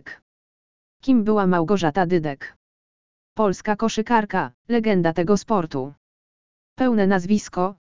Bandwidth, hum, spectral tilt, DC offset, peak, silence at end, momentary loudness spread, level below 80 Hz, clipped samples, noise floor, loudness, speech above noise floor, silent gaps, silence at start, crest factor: 7.6 kHz; none; -6.5 dB/octave; 1%; -2 dBFS; 0.05 s; 11 LU; -52 dBFS; under 0.1%; under -90 dBFS; -21 LUFS; over 70 dB; 0.22-1.00 s, 2.56-3.36 s, 4.54-4.65 s, 5.97-6.76 s; 0 s; 18 dB